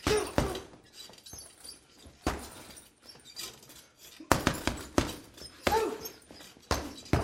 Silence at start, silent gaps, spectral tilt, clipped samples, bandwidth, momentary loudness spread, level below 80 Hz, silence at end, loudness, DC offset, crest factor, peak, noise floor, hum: 0 s; none; -4 dB/octave; under 0.1%; 16 kHz; 22 LU; -46 dBFS; 0 s; -33 LUFS; under 0.1%; 34 dB; -2 dBFS; -56 dBFS; none